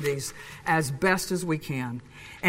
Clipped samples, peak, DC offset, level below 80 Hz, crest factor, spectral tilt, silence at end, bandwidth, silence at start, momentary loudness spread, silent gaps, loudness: under 0.1%; -10 dBFS; under 0.1%; -56 dBFS; 18 dB; -4.5 dB/octave; 0 s; 16 kHz; 0 s; 12 LU; none; -28 LUFS